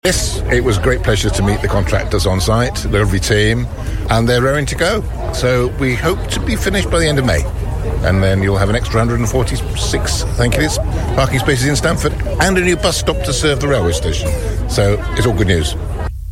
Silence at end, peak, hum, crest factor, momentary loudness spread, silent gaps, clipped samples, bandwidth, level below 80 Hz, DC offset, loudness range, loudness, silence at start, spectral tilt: 0 s; 0 dBFS; none; 14 dB; 5 LU; none; under 0.1%; 16.5 kHz; -22 dBFS; under 0.1%; 1 LU; -15 LUFS; 0.05 s; -5 dB/octave